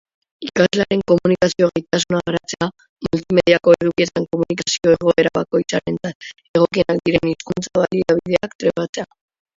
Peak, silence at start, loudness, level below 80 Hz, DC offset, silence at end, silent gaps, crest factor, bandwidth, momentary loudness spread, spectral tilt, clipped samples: 0 dBFS; 0.4 s; -18 LUFS; -50 dBFS; under 0.1%; 0.5 s; 2.89-2.96 s, 6.15-6.20 s, 6.49-6.54 s, 8.55-8.59 s, 8.89-8.93 s; 18 dB; 7.8 kHz; 10 LU; -5 dB/octave; under 0.1%